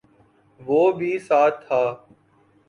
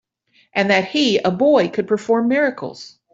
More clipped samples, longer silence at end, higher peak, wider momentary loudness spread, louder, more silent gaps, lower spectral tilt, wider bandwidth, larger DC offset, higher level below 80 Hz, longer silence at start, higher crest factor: neither; first, 0.75 s vs 0.25 s; second, -6 dBFS vs -2 dBFS; about the same, 13 LU vs 13 LU; second, -21 LUFS vs -17 LUFS; neither; first, -7 dB/octave vs -5 dB/octave; first, 10.5 kHz vs 7.8 kHz; neither; second, -68 dBFS vs -62 dBFS; about the same, 0.6 s vs 0.55 s; about the same, 16 dB vs 16 dB